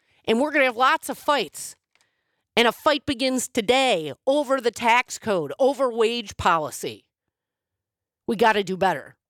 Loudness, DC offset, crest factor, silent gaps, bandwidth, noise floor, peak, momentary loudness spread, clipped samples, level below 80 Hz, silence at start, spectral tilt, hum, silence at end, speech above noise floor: -22 LUFS; under 0.1%; 18 dB; none; 18 kHz; -87 dBFS; -6 dBFS; 10 LU; under 0.1%; -58 dBFS; 0.25 s; -3 dB/octave; none; 0.2 s; 65 dB